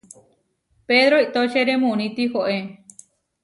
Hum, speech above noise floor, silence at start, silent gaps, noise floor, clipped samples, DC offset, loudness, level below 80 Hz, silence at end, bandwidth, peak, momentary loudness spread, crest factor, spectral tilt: none; 46 dB; 0.9 s; none; -65 dBFS; under 0.1%; under 0.1%; -19 LUFS; -68 dBFS; 0.7 s; 11.5 kHz; -6 dBFS; 9 LU; 16 dB; -4.5 dB/octave